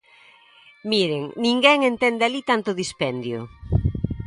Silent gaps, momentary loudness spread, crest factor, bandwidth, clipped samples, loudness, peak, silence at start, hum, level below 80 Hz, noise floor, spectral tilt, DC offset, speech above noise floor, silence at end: none; 12 LU; 22 dB; 11.5 kHz; under 0.1%; -21 LUFS; -2 dBFS; 0.85 s; none; -38 dBFS; -52 dBFS; -5 dB/octave; under 0.1%; 31 dB; 0 s